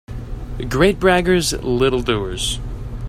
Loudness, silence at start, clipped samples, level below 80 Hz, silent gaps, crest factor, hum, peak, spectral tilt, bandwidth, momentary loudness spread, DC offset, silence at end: -18 LUFS; 0.1 s; under 0.1%; -30 dBFS; none; 18 dB; none; 0 dBFS; -4.5 dB/octave; 15.5 kHz; 16 LU; under 0.1%; 0 s